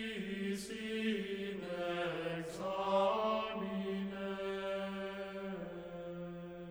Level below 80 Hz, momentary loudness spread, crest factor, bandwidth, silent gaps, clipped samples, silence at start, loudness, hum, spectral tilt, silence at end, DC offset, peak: -68 dBFS; 12 LU; 18 dB; over 20 kHz; none; under 0.1%; 0 s; -39 LUFS; none; -5.5 dB/octave; 0 s; under 0.1%; -22 dBFS